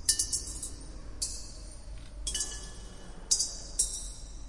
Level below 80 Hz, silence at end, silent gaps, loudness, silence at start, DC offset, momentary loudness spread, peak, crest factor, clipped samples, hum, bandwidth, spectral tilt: -44 dBFS; 0 s; none; -32 LUFS; 0 s; under 0.1%; 20 LU; -10 dBFS; 26 dB; under 0.1%; none; 11.5 kHz; -0.5 dB/octave